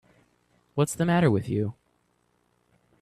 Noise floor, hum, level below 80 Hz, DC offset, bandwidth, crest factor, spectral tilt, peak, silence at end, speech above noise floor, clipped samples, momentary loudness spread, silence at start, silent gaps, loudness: -70 dBFS; 60 Hz at -50 dBFS; -60 dBFS; under 0.1%; 14 kHz; 18 dB; -6.5 dB/octave; -10 dBFS; 1.3 s; 46 dB; under 0.1%; 11 LU; 0.75 s; none; -26 LUFS